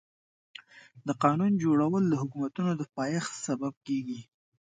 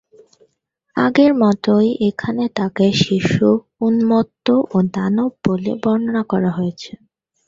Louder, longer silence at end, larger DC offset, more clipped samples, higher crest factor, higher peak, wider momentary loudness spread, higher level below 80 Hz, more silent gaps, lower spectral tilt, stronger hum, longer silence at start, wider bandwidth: second, -29 LUFS vs -17 LUFS; second, 0.45 s vs 0.6 s; neither; neither; first, 22 dB vs 16 dB; second, -8 dBFS vs -2 dBFS; first, 18 LU vs 7 LU; second, -74 dBFS vs -52 dBFS; first, 3.77-3.81 s vs none; about the same, -6.5 dB/octave vs -7 dB/octave; neither; second, 0.75 s vs 0.95 s; first, 9.4 kHz vs 7.6 kHz